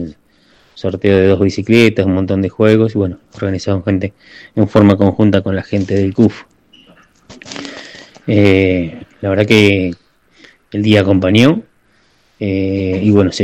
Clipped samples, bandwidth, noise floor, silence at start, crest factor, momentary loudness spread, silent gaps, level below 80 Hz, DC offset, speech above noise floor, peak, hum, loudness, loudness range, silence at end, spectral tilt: 0.3%; 12 kHz; -54 dBFS; 0 s; 14 dB; 15 LU; none; -46 dBFS; under 0.1%; 42 dB; 0 dBFS; none; -13 LUFS; 3 LU; 0 s; -7 dB/octave